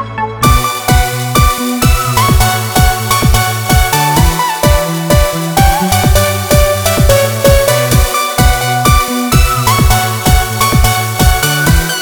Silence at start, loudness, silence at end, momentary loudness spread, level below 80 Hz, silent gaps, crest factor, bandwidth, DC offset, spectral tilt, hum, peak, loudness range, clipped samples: 0 s; -10 LUFS; 0 s; 2 LU; -16 dBFS; none; 10 dB; over 20 kHz; under 0.1%; -4 dB/octave; none; 0 dBFS; 1 LU; 0.6%